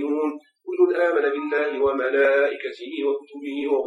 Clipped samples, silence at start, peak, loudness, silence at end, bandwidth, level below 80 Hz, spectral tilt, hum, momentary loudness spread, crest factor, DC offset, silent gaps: under 0.1%; 0 s; -8 dBFS; -23 LUFS; 0 s; 7.2 kHz; -66 dBFS; -5 dB/octave; none; 12 LU; 14 dB; under 0.1%; none